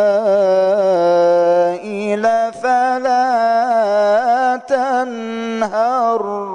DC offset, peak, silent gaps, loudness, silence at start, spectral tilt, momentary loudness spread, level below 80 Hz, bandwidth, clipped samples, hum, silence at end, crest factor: under 0.1%; -6 dBFS; none; -15 LUFS; 0 s; -5 dB/octave; 7 LU; -66 dBFS; 10 kHz; under 0.1%; none; 0 s; 10 dB